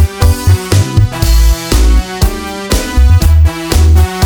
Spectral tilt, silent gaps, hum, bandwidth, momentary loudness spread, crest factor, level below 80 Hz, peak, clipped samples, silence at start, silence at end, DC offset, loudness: -5.5 dB/octave; none; none; 19 kHz; 7 LU; 8 dB; -10 dBFS; 0 dBFS; 0.9%; 0 s; 0 s; under 0.1%; -11 LUFS